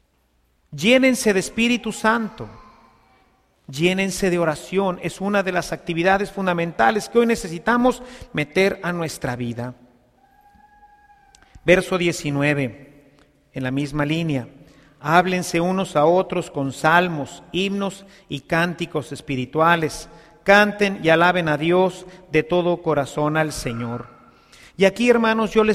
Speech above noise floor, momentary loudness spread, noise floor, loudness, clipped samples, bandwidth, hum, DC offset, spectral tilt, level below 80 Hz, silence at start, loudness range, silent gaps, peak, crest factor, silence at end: 44 dB; 13 LU; -64 dBFS; -20 LUFS; under 0.1%; 15.5 kHz; none; under 0.1%; -5 dB/octave; -48 dBFS; 0.7 s; 5 LU; none; 0 dBFS; 20 dB; 0 s